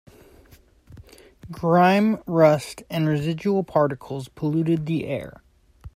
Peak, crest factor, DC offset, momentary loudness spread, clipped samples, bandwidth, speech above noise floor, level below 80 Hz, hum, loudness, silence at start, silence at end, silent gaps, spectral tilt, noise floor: -4 dBFS; 20 dB; under 0.1%; 14 LU; under 0.1%; 15.5 kHz; 32 dB; -54 dBFS; none; -22 LUFS; 0.9 s; 0.1 s; none; -7.5 dB/octave; -53 dBFS